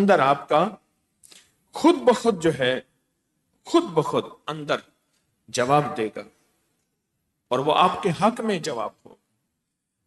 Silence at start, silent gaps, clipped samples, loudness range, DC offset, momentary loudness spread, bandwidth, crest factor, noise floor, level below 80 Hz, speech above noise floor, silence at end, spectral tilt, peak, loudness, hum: 0 s; none; under 0.1%; 4 LU; under 0.1%; 12 LU; 12 kHz; 18 dB; -79 dBFS; -64 dBFS; 57 dB; 1.15 s; -5 dB/octave; -6 dBFS; -23 LUFS; none